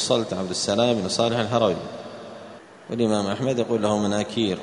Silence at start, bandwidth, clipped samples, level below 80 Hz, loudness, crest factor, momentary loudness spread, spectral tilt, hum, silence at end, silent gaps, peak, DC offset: 0 s; 10.5 kHz; under 0.1%; -60 dBFS; -23 LUFS; 18 dB; 17 LU; -4.5 dB/octave; none; 0 s; none; -6 dBFS; under 0.1%